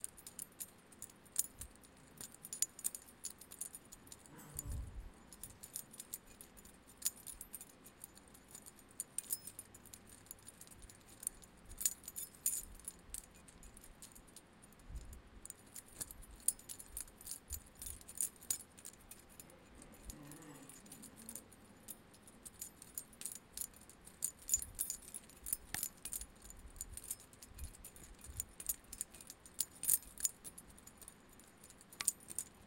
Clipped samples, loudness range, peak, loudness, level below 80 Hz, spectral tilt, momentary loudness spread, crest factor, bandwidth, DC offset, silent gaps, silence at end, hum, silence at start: under 0.1%; 10 LU; -14 dBFS; -44 LUFS; -62 dBFS; -1 dB/octave; 19 LU; 34 dB; 17 kHz; under 0.1%; none; 0 s; none; 0 s